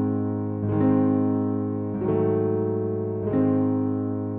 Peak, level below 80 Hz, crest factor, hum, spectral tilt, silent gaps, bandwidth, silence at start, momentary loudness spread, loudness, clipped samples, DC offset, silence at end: -12 dBFS; -56 dBFS; 12 dB; none; -13.5 dB/octave; none; 3.1 kHz; 0 s; 6 LU; -24 LUFS; under 0.1%; under 0.1%; 0 s